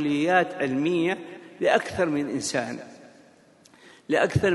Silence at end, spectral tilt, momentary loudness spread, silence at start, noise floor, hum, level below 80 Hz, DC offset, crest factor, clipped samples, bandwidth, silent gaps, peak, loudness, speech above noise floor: 0 s; -5 dB/octave; 13 LU; 0 s; -55 dBFS; none; -54 dBFS; under 0.1%; 20 dB; under 0.1%; 11.5 kHz; none; -6 dBFS; -25 LUFS; 32 dB